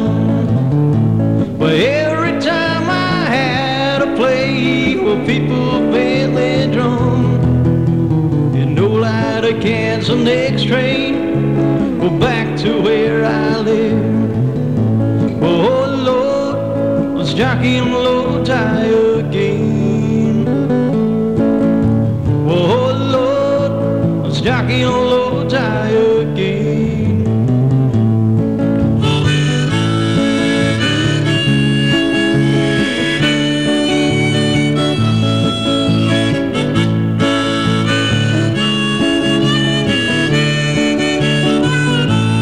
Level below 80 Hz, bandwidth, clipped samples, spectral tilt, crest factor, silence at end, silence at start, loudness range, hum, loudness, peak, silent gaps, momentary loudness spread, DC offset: -38 dBFS; 11 kHz; under 0.1%; -6.5 dB/octave; 10 dB; 0 s; 0 s; 1 LU; none; -14 LUFS; -2 dBFS; none; 2 LU; 0.8%